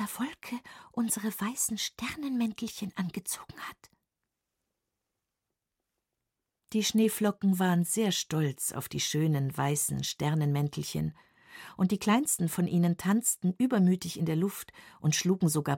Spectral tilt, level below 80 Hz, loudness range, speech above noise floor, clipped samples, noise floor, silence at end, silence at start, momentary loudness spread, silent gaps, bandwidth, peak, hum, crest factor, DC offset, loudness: -4.5 dB/octave; -66 dBFS; 9 LU; 57 dB; under 0.1%; -87 dBFS; 0 s; 0 s; 11 LU; none; 17 kHz; -14 dBFS; none; 16 dB; under 0.1%; -30 LUFS